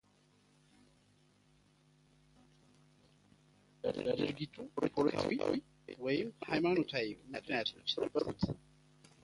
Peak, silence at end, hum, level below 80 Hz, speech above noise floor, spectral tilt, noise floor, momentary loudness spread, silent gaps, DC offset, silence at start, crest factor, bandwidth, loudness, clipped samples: -16 dBFS; 0.65 s; none; -66 dBFS; 33 dB; -6 dB/octave; -70 dBFS; 10 LU; none; under 0.1%; 3.85 s; 22 dB; 11.5 kHz; -37 LUFS; under 0.1%